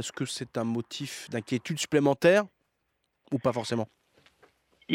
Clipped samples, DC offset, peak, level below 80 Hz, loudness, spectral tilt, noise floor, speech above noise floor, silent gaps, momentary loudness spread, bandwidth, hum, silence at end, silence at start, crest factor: under 0.1%; under 0.1%; -10 dBFS; -70 dBFS; -28 LUFS; -5 dB/octave; -77 dBFS; 49 dB; none; 14 LU; 16.5 kHz; none; 0 s; 0 s; 20 dB